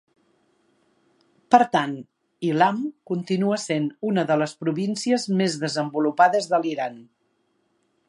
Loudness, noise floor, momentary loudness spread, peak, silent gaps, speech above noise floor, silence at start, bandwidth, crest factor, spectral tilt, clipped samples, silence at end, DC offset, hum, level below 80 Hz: -23 LUFS; -69 dBFS; 11 LU; -2 dBFS; none; 47 dB; 1.5 s; 11.5 kHz; 22 dB; -5.5 dB/octave; under 0.1%; 1.05 s; under 0.1%; none; -76 dBFS